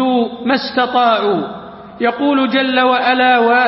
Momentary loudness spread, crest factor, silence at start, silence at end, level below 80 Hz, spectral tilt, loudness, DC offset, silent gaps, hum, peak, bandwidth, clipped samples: 9 LU; 12 dB; 0 s; 0 s; -56 dBFS; -8.5 dB/octave; -14 LUFS; under 0.1%; none; none; -2 dBFS; 5.8 kHz; under 0.1%